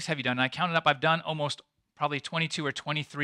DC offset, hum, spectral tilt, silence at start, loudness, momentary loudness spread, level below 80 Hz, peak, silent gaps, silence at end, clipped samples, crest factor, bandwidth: under 0.1%; none; -4.5 dB/octave; 0 s; -28 LUFS; 8 LU; -72 dBFS; -8 dBFS; none; 0 s; under 0.1%; 22 dB; 11 kHz